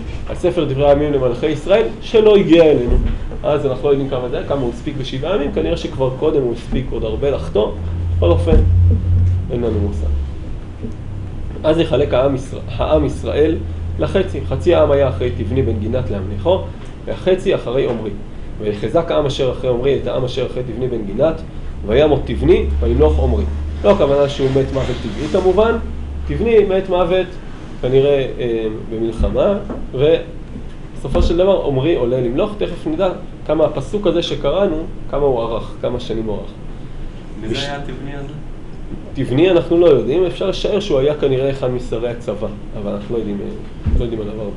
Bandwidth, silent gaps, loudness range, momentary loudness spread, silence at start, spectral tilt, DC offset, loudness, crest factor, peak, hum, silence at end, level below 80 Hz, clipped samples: 10.5 kHz; none; 5 LU; 15 LU; 0 s; -7.5 dB/octave; under 0.1%; -17 LUFS; 16 dB; 0 dBFS; none; 0 s; -26 dBFS; under 0.1%